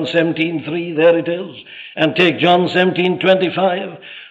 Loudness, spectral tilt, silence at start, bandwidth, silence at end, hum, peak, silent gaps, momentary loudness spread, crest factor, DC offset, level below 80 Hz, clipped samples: -15 LUFS; -7 dB/octave; 0 s; 7.8 kHz; 0 s; none; -2 dBFS; none; 16 LU; 14 dB; under 0.1%; -66 dBFS; under 0.1%